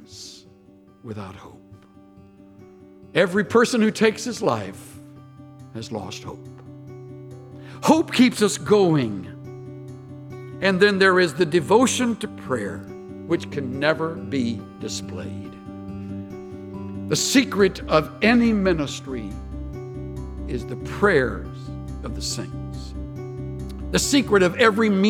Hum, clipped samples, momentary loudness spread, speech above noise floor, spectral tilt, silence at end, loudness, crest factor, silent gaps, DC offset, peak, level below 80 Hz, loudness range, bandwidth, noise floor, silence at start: none; under 0.1%; 21 LU; 30 dB; -4.5 dB/octave; 0 s; -21 LUFS; 20 dB; none; under 0.1%; -4 dBFS; -42 dBFS; 7 LU; 17 kHz; -51 dBFS; 0 s